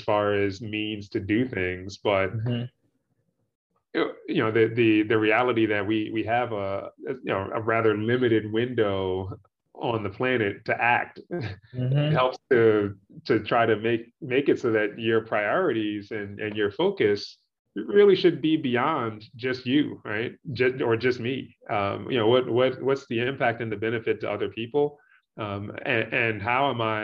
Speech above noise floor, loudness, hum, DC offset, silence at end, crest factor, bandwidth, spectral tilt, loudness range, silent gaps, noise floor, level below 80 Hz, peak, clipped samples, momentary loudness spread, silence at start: 49 dB; -25 LUFS; none; under 0.1%; 0 s; 18 dB; 7.2 kHz; -7.5 dB/octave; 4 LU; 3.55-3.70 s, 17.59-17.65 s; -73 dBFS; -66 dBFS; -8 dBFS; under 0.1%; 11 LU; 0 s